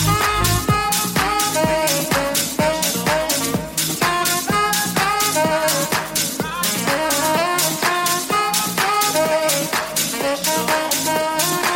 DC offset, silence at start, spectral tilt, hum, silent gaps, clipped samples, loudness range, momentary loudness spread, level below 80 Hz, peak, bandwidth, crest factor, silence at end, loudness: under 0.1%; 0 s; -2.5 dB/octave; none; none; under 0.1%; 1 LU; 3 LU; -40 dBFS; -4 dBFS; 17 kHz; 14 dB; 0 s; -18 LUFS